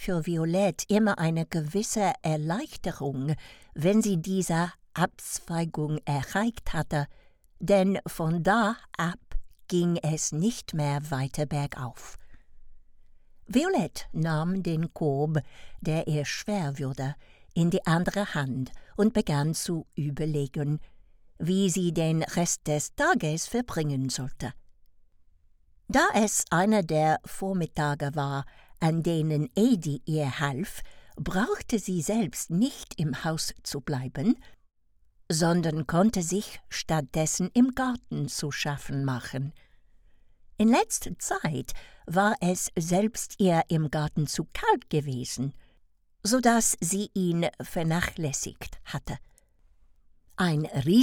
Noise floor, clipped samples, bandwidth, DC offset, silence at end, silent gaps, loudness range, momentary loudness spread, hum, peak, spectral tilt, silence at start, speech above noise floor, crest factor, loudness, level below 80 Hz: -63 dBFS; under 0.1%; 17.5 kHz; under 0.1%; 0 s; none; 4 LU; 11 LU; none; -8 dBFS; -5 dB/octave; 0 s; 36 dB; 20 dB; -28 LUFS; -48 dBFS